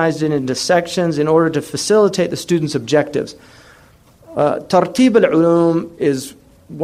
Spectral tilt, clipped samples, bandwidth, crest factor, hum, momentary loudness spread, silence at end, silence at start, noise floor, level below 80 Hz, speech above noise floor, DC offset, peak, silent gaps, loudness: -5.5 dB/octave; under 0.1%; 15 kHz; 16 dB; none; 9 LU; 0 s; 0 s; -47 dBFS; -54 dBFS; 32 dB; under 0.1%; 0 dBFS; none; -16 LUFS